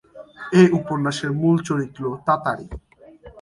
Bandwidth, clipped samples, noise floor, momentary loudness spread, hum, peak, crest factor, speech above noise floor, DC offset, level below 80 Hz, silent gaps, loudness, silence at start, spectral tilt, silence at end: 11.5 kHz; under 0.1%; -46 dBFS; 18 LU; none; -2 dBFS; 18 dB; 26 dB; under 0.1%; -48 dBFS; none; -20 LUFS; 0.15 s; -7 dB/octave; 0 s